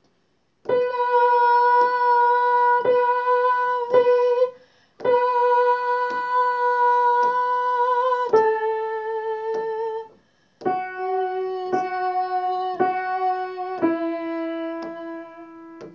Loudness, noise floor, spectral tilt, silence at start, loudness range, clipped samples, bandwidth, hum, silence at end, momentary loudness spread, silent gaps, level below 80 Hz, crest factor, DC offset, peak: -21 LUFS; -67 dBFS; -5.5 dB/octave; 0.65 s; 8 LU; under 0.1%; 6.8 kHz; none; 0.05 s; 12 LU; none; -74 dBFS; 16 dB; under 0.1%; -6 dBFS